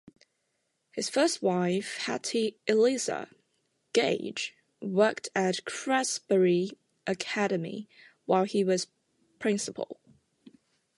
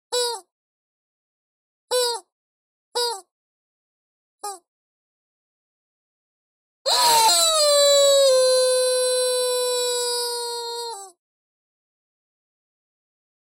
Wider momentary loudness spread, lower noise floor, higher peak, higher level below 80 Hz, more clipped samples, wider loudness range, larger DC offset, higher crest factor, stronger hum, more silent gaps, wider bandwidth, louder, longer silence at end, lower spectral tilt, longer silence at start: second, 14 LU vs 20 LU; second, -78 dBFS vs under -90 dBFS; second, -10 dBFS vs -6 dBFS; second, -78 dBFS vs -72 dBFS; neither; second, 3 LU vs 16 LU; neither; about the same, 20 dB vs 18 dB; neither; second, none vs 0.52-1.88 s, 2.32-2.92 s, 3.31-4.38 s, 4.68-6.85 s; second, 11.5 kHz vs 16.5 kHz; second, -29 LUFS vs -19 LUFS; second, 0.5 s vs 2.4 s; first, -4 dB/octave vs 2.5 dB/octave; first, 0.95 s vs 0.1 s